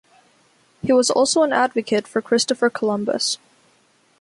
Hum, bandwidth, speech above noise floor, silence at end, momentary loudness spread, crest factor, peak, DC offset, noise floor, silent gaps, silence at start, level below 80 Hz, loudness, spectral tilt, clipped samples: none; 11.5 kHz; 40 dB; 0.85 s; 6 LU; 14 dB; -6 dBFS; under 0.1%; -59 dBFS; none; 0.85 s; -64 dBFS; -19 LUFS; -3 dB/octave; under 0.1%